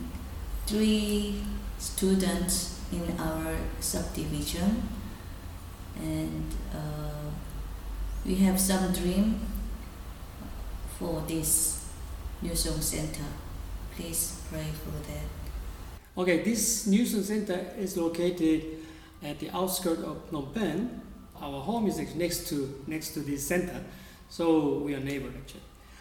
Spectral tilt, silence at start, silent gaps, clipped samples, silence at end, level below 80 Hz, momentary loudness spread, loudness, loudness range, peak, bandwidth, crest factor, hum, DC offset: -4.5 dB/octave; 0 s; none; under 0.1%; 0 s; -40 dBFS; 16 LU; -30 LUFS; 5 LU; -10 dBFS; 19 kHz; 20 dB; none; under 0.1%